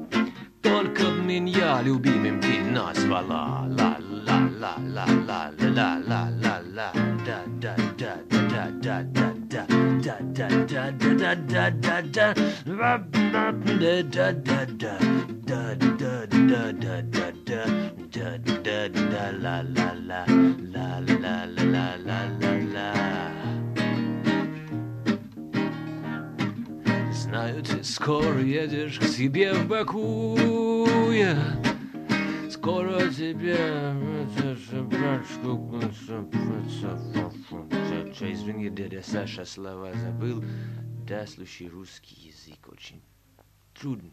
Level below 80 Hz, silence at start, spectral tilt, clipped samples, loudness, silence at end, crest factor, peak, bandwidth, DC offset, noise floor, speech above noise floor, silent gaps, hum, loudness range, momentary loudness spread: -60 dBFS; 0 s; -6.5 dB/octave; under 0.1%; -26 LUFS; 0.05 s; 18 dB; -8 dBFS; 13.5 kHz; under 0.1%; -59 dBFS; 34 dB; none; none; 9 LU; 11 LU